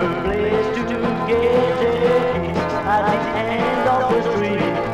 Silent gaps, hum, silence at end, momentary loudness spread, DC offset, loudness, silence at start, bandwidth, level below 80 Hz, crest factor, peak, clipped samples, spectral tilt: none; none; 0 s; 4 LU; under 0.1%; -19 LUFS; 0 s; 11.5 kHz; -40 dBFS; 12 dB; -6 dBFS; under 0.1%; -6.5 dB/octave